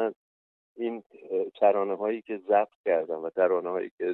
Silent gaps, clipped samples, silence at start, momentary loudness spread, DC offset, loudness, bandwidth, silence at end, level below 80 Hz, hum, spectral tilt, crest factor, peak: 0.16-0.75 s, 1.06-1.10 s, 2.75-2.84 s, 3.91-3.98 s; under 0.1%; 0 s; 10 LU; under 0.1%; -28 LUFS; 4.1 kHz; 0 s; -82 dBFS; none; -9 dB/octave; 18 dB; -10 dBFS